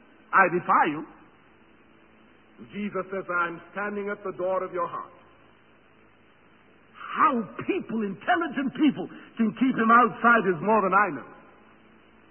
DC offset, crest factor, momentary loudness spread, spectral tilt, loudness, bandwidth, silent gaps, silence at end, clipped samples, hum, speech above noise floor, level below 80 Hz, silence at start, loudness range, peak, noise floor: under 0.1%; 20 dB; 17 LU; -10 dB/octave; -24 LUFS; 3.3 kHz; none; 0.95 s; under 0.1%; none; 33 dB; -70 dBFS; 0.3 s; 11 LU; -6 dBFS; -58 dBFS